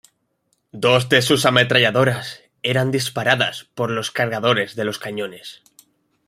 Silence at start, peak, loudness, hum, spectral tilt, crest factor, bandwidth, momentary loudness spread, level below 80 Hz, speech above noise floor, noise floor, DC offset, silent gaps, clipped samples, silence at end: 0.75 s; -2 dBFS; -18 LUFS; none; -4 dB/octave; 20 dB; 16 kHz; 13 LU; -60 dBFS; 50 dB; -69 dBFS; under 0.1%; none; under 0.1%; 0.7 s